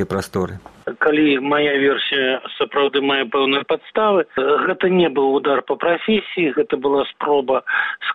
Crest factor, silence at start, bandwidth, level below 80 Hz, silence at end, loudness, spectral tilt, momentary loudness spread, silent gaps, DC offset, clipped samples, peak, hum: 14 dB; 0 s; 12.5 kHz; -56 dBFS; 0 s; -18 LUFS; -5.5 dB/octave; 6 LU; none; under 0.1%; under 0.1%; -4 dBFS; none